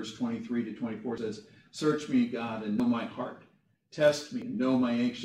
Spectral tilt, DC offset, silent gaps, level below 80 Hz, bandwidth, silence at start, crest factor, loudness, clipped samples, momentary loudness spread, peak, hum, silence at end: -5.5 dB/octave; under 0.1%; none; -70 dBFS; 11 kHz; 0 s; 18 dB; -31 LUFS; under 0.1%; 12 LU; -12 dBFS; none; 0 s